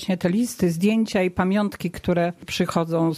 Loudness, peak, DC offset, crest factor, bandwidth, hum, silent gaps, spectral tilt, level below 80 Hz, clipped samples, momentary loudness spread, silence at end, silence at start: -23 LUFS; -8 dBFS; under 0.1%; 14 dB; 15 kHz; none; none; -6 dB/octave; -50 dBFS; under 0.1%; 5 LU; 0 s; 0 s